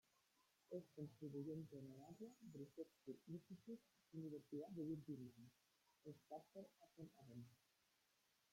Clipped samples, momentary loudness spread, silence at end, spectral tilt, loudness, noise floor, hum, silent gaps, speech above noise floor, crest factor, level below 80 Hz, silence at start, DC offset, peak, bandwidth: under 0.1%; 12 LU; 0.95 s; -8 dB/octave; -58 LUFS; -84 dBFS; none; none; 27 dB; 18 dB; under -90 dBFS; 0.7 s; under 0.1%; -40 dBFS; 16.5 kHz